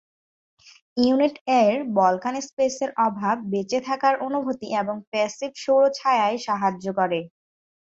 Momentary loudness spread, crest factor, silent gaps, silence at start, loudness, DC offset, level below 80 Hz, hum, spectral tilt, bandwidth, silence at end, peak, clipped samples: 7 LU; 18 dB; 1.41-1.45 s, 2.53-2.57 s, 5.07-5.12 s; 0.95 s; -23 LUFS; under 0.1%; -68 dBFS; none; -5 dB/octave; 8 kHz; 0.65 s; -6 dBFS; under 0.1%